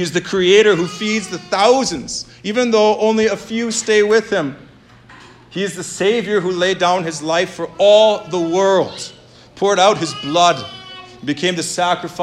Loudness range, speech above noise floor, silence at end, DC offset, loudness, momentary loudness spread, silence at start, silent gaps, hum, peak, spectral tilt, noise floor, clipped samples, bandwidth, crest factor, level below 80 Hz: 4 LU; 28 dB; 0 s; under 0.1%; -16 LUFS; 13 LU; 0 s; none; none; 0 dBFS; -3.5 dB/octave; -44 dBFS; under 0.1%; 13 kHz; 16 dB; -54 dBFS